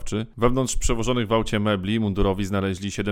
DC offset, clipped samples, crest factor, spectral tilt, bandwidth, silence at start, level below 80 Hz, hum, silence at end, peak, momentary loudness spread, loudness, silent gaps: under 0.1%; under 0.1%; 18 dB; -5 dB/octave; 15.5 kHz; 0 s; -32 dBFS; none; 0 s; -4 dBFS; 4 LU; -24 LUFS; none